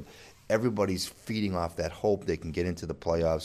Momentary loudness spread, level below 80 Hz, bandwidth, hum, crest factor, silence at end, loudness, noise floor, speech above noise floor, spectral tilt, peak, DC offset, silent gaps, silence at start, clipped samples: 5 LU; -48 dBFS; 15 kHz; none; 18 dB; 0 s; -30 LUFS; -50 dBFS; 20 dB; -5.5 dB/octave; -12 dBFS; under 0.1%; none; 0 s; under 0.1%